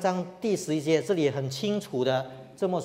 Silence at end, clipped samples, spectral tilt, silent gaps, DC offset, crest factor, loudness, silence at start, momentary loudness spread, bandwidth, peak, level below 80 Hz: 0 s; under 0.1%; -5.5 dB/octave; none; under 0.1%; 16 dB; -28 LUFS; 0 s; 5 LU; 16 kHz; -10 dBFS; -70 dBFS